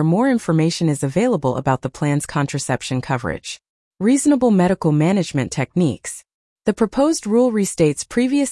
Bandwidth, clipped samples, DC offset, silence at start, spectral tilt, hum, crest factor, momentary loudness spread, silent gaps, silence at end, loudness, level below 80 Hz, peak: 12 kHz; under 0.1%; under 0.1%; 0 s; -6 dB/octave; none; 14 dB; 8 LU; 3.69-3.91 s, 6.34-6.56 s; 0 s; -19 LUFS; -50 dBFS; -4 dBFS